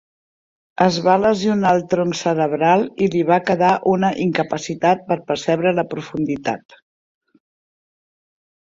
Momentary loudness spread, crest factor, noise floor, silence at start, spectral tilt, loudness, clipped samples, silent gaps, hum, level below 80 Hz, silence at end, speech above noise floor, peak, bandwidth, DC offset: 8 LU; 18 dB; under -90 dBFS; 0.8 s; -6 dB/octave; -18 LUFS; under 0.1%; none; none; -58 dBFS; 2.05 s; over 72 dB; -2 dBFS; 7.8 kHz; under 0.1%